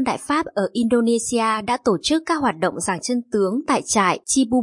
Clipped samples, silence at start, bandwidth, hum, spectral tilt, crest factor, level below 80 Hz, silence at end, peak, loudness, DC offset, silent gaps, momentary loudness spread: under 0.1%; 0 s; 11.5 kHz; none; -3.5 dB/octave; 16 dB; -54 dBFS; 0 s; -4 dBFS; -20 LUFS; under 0.1%; none; 4 LU